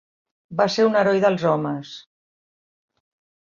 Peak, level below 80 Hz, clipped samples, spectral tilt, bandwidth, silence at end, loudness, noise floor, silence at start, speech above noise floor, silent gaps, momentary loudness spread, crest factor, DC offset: -4 dBFS; -68 dBFS; under 0.1%; -6 dB/octave; 7.4 kHz; 1.45 s; -20 LUFS; under -90 dBFS; 0.5 s; over 70 dB; none; 16 LU; 18 dB; under 0.1%